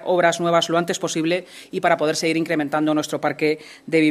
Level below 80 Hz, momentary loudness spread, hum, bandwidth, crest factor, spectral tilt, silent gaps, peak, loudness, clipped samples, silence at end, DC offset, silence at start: -68 dBFS; 5 LU; none; 14.5 kHz; 16 dB; -4.5 dB/octave; none; -4 dBFS; -21 LUFS; under 0.1%; 0 s; under 0.1%; 0 s